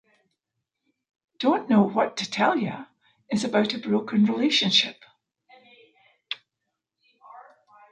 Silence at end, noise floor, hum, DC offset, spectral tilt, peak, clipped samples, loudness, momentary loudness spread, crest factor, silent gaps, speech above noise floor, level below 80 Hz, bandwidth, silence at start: 0.5 s; -83 dBFS; none; under 0.1%; -4.5 dB/octave; -6 dBFS; under 0.1%; -23 LUFS; 16 LU; 20 dB; none; 60 dB; -74 dBFS; 9.4 kHz; 1.4 s